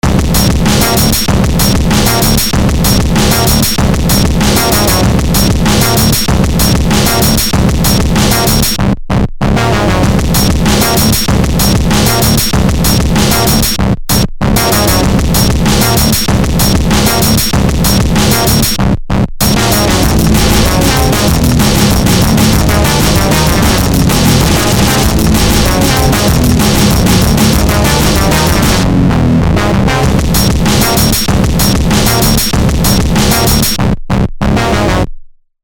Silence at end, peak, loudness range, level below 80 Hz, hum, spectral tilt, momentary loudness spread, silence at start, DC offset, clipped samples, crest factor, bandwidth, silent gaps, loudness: 0.35 s; 0 dBFS; 1 LU; -16 dBFS; none; -4.5 dB/octave; 3 LU; 0.05 s; under 0.1%; 0.1%; 8 dB; 18.5 kHz; none; -9 LUFS